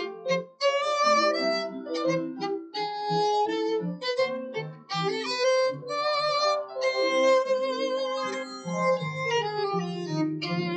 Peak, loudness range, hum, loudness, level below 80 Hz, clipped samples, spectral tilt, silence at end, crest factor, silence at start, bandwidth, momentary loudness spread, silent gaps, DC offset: -12 dBFS; 3 LU; none; -27 LUFS; -84 dBFS; under 0.1%; -4.5 dB/octave; 0 s; 16 dB; 0 s; 8.8 kHz; 9 LU; none; under 0.1%